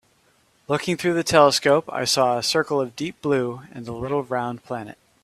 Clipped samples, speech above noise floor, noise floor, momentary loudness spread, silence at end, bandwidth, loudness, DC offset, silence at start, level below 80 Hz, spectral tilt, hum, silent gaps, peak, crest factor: under 0.1%; 40 dB; -61 dBFS; 16 LU; 0.3 s; 15 kHz; -21 LUFS; under 0.1%; 0.7 s; -58 dBFS; -4 dB/octave; none; none; 0 dBFS; 22 dB